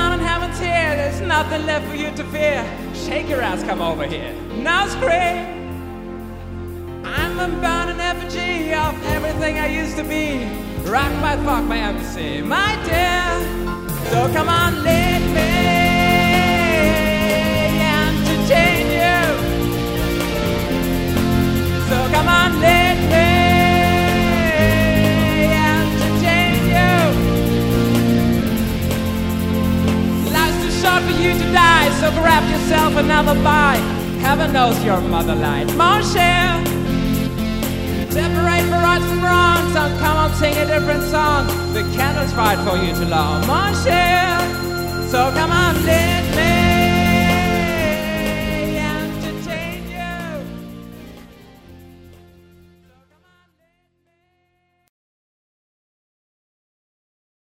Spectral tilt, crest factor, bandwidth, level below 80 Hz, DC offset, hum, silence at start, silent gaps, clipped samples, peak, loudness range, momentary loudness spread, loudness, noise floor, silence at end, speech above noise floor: -5 dB/octave; 16 dB; 16.5 kHz; -30 dBFS; under 0.1%; none; 0 s; none; under 0.1%; -2 dBFS; 8 LU; 11 LU; -17 LUFS; -65 dBFS; 5.5 s; 48 dB